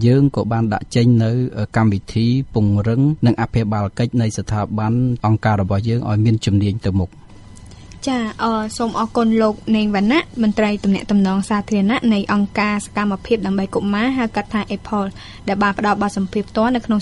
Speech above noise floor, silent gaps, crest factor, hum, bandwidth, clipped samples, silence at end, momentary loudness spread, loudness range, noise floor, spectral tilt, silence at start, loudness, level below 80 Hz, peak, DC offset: 22 dB; none; 14 dB; none; 11.5 kHz; under 0.1%; 0 s; 6 LU; 3 LU; -39 dBFS; -7 dB/octave; 0 s; -18 LUFS; -40 dBFS; -2 dBFS; under 0.1%